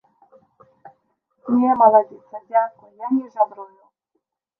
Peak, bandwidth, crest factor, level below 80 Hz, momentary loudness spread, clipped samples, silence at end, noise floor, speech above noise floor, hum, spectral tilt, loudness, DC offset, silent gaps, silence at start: -2 dBFS; 2.7 kHz; 20 dB; -72 dBFS; 22 LU; under 0.1%; 0.95 s; -75 dBFS; 56 dB; none; -10 dB/octave; -19 LUFS; under 0.1%; none; 1.45 s